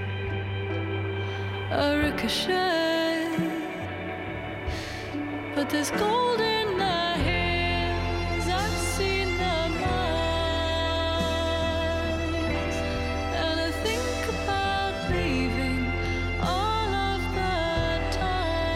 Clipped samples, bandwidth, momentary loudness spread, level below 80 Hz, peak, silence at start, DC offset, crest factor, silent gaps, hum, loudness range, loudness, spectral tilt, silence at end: under 0.1%; 15.5 kHz; 7 LU; -36 dBFS; -12 dBFS; 0 s; under 0.1%; 14 dB; none; none; 2 LU; -27 LUFS; -5 dB/octave; 0 s